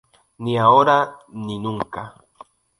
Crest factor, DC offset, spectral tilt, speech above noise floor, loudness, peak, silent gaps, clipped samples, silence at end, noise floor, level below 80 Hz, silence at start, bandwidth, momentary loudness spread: 20 dB; under 0.1%; -6.5 dB/octave; 29 dB; -18 LUFS; -2 dBFS; none; under 0.1%; 0.7 s; -48 dBFS; -58 dBFS; 0.4 s; 11 kHz; 19 LU